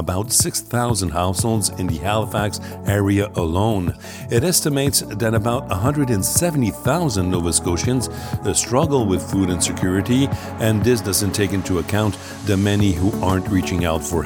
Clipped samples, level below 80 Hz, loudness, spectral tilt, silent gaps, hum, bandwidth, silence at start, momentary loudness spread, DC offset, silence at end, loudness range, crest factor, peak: under 0.1%; -38 dBFS; -19 LUFS; -4.5 dB/octave; none; none; 19 kHz; 0 s; 5 LU; under 0.1%; 0 s; 1 LU; 18 dB; -2 dBFS